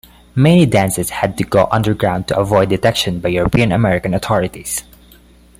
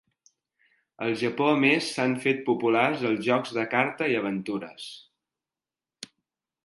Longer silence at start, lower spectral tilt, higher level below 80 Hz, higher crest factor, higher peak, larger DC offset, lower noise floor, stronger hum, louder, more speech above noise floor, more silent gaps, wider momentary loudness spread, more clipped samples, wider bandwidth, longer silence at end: second, 0.35 s vs 1 s; about the same, -5.5 dB/octave vs -5 dB/octave; first, -36 dBFS vs -74 dBFS; second, 14 dB vs 22 dB; first, -2 dBFS vs -6 dBFS; neither; second, -45 dBFS vs under -90 dBFS; first, 60 Hz at -35 dBFS vs none; first, -15 LUFS vs -25 LUFS; second, 31 dB vs over 64 dB; neither; second, 8 LU vs 19 LU; neither; first, 16 kHz vs 11.5 kHz; first, 0.8 s vs 0.6 s